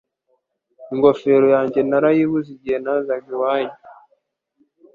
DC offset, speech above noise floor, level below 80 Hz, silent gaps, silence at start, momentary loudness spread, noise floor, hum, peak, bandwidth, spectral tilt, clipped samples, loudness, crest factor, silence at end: under 0.1%; 51 dB; -62 dBFS; none; 0.8 s; 10 LU; -68 dBFS; none; -2 dBFS; 4.8 kHz; -8.5 dB/octave; under 0.1%; -18 LUFS; 18 dB; 1 s